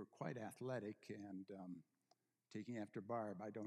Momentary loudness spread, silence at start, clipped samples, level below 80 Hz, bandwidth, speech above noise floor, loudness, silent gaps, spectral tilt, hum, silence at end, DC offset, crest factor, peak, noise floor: 8 LU; 0 s; under 0.1%; under -90 dBFS; 12 kHz; 33 dB; -51 LUFS; none; -7 dB/octave; none; 0 s; under 0.1%; 18 dB; -32 dBFS; -83 dBFS